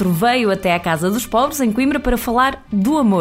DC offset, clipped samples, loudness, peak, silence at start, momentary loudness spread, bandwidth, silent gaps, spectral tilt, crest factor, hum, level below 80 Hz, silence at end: under 0.1%; under 0.1%; -17 LUFS; -2 dBFS; 0 s; 3 LU; 16 kHz; none; -5 dB/octave; 14 dB; none; -34 dBFS; 0 s